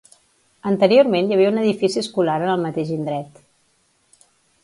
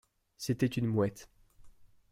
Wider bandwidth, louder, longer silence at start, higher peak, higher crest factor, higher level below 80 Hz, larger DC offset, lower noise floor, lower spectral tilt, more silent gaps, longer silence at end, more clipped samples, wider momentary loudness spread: second, 11.5 kHz vs 16 kHz; first, -19 LUFS vs -33 LUFS; first, 0.65 s vs 0.4 s; first, -2 dBFS vs -18 dBFS; about the same, 18 dB vs 18 dB; about the same, -66 dBFS vs -62 dBFS; neither; first, -63 dBFS vs -56 dBFS; about the same, -6 dB/octave vs -6.5 dB/octave; neither; first, 1.35 s vs 0.25 s; neither; about the same, 13 LU vs 11 LU